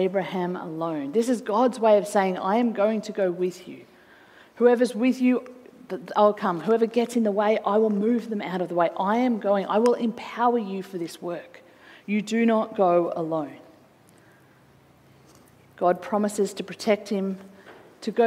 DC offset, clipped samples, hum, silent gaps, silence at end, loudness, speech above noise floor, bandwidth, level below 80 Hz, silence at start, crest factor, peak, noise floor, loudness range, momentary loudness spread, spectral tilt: under 0.1%; under 0.1%; none; none; 0 s; -24 LUFS; 32 dB; 15 kHz; -74 dBFS; 0 s; 18 dB; -6 dBFS; -56 dBFS; 5 LU; 11 LU; -6 dB/octave